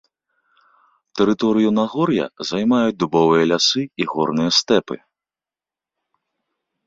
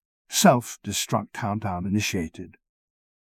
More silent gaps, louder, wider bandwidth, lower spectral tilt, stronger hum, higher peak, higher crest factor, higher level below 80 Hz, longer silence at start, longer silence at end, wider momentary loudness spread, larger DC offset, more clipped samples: neither; first, -18 LUFS vs -24 LUFS; second, 7.8 kHz vs 16 kHz; about the same, -4.5 dB/octave vs -4 dB/octave; neither; about the same, -2 dBFS vs -4 dBFS; about the same, 18 dB vs 22 dB; second, -58 dBFS vs -50 dBFS; first, 1.15 s vs 0.3 s; first, 1.9 s vs 0.7 s; second, 8 LU vs 15 LU; neither; neither